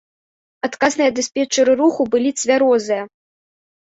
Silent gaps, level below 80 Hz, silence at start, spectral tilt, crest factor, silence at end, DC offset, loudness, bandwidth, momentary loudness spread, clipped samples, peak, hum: none; -62 dBFS; 0.65 s; -2.5 dB/octave; 16 dB; 0.8 s; under 0.1%; -17 LUFS; 8 kHz; 10 LU; under 0.1%; -2 dBFS; none